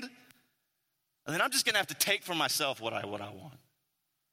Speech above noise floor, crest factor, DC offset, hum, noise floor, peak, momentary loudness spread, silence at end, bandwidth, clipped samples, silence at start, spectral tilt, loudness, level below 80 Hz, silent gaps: 49 dB; 24 dB; under 0.1%; none; -81 dBFS; -12 dBFS; 19 LU; 0.75 s; 16.5 kHz; under 0.1%; 0 s; -1.5 dB/octave; -30 LUFS; -78 dBFS; none